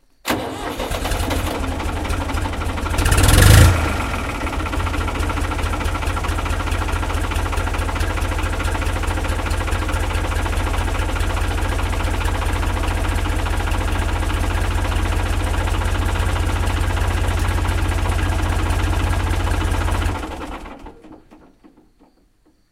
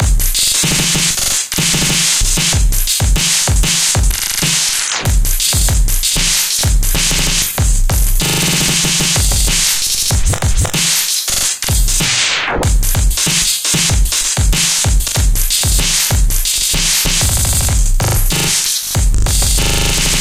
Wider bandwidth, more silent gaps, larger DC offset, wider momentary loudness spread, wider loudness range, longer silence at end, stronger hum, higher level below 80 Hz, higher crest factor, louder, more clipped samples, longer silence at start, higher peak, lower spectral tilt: about the same, 16 kHz vs 16.5 kHz; neither; neither; about the same, 3 LU vs 3 LU; first, 6 LU vs 1 LU; first, 1.35 s vs 0 s; neither; second, -22 dBFS vs -16 dBFS; first, 20 dB vs 12 dB; second, -21 LUFS vs -12 LUFS; neither; first, 0.25 s vs 0 s; about the same, 0 dBFS vs 0 dBFS; first, -5 dB/octave vs -2 dB/octave